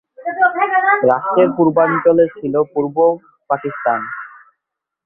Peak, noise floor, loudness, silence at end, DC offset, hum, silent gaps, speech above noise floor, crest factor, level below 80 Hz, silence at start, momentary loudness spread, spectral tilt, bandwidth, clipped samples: 0 dBFS; -80 dBFS; -15 LUFS; 0.8 s; under 0.1%; none; none; 66 dB; 16 dB; -62 dBFS; 0.2 s; 12 LU; -10 dB/octave; 3.8 kHz; under 0.1%